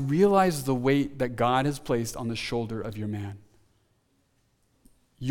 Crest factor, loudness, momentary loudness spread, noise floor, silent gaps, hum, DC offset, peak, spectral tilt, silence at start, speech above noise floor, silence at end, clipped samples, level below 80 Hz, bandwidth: 20 dB; -27 LUFS; 14 LU; -69 dBFS; none; none; under 0.1%; -8 dBFS; -6 dB/octave; 0 s; 43 dB; 0 s; under 0.1%; -54 dBFS; 18.5 kHz